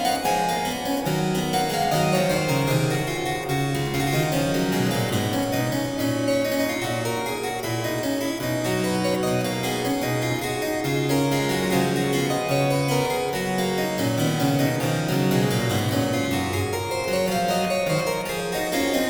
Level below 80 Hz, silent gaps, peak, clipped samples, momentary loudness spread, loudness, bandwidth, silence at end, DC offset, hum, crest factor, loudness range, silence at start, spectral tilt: -48 dBFS; none; -8 dBFS; under 0.1%; 4 LU; -23 LUFS; over 20 kHz; 0 s; under 0.1%; none; 14 dB; 2 LU; 0 s; -5 dB/octave